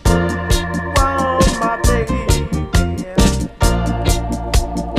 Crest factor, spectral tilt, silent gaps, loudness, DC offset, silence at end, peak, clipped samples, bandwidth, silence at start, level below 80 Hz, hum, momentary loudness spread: 14 dB; -5 dB/octave; none; -17 LUFS; under 0.1%; 0 s; -2 dBFS; under 0.1%; 15.5 kHz; 0.05 s; -20 dBFS; none; 4 LU